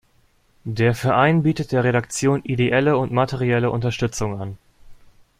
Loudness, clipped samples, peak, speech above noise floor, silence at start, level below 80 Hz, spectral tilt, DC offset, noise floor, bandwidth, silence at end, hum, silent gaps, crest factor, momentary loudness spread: -20 LUFS; under 0.1%; -2 dBFS; 40 dB; 0.65 s; -48 dBFS; -6 dB/octave; under 0.1%; -59 dBFS; 15 kHz; 0.45 s; none; none; 18 dB; 10 LU